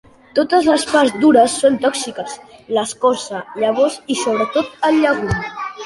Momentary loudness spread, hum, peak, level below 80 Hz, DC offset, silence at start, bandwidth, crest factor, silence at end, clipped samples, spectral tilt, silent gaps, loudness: 13 LU; none; -2 dBFS; -44 dBFS; under 0.1%; 0.35 s; 11.5 kHz; 16 dB; 0 s; under 0.1%; -4 dB/octave; none; -16 LUFS